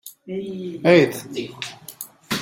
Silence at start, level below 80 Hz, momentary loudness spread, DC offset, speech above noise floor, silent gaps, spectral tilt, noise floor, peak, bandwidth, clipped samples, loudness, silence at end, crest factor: 0.05 s; -64 dBFS; 20 LU; under 0.1%; 20 dB; none; -5 dB/octave; -40 dBFS; -2 dBFS; 16.5 kHz; under 0.1%; -21 LUFS; 0 s; 20 dB